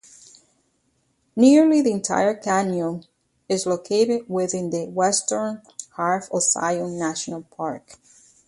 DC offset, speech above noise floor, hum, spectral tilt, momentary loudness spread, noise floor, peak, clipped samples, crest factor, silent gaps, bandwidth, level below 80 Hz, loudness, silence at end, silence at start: under 0.1%; 47 dB; none; -4 dB/octave; 15 LU; -68 dBFS; -4 dBFS; under 0.1%; 18 dB; none; 11.5 kHz; -66 dBFS; -21 LUFS; 0.55 s; 1.35 s